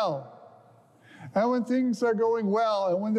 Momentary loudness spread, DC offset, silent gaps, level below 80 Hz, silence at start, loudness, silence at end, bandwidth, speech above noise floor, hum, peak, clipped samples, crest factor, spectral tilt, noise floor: 7 LU; under 0.1%; none; -82 dBFS; 0 s; -26 LUFS; 0 s; 11 kHz; 31 dB; none; -14 dBFS; under 0.1%; 12 dB; -7 dB/octave; -57 dBFS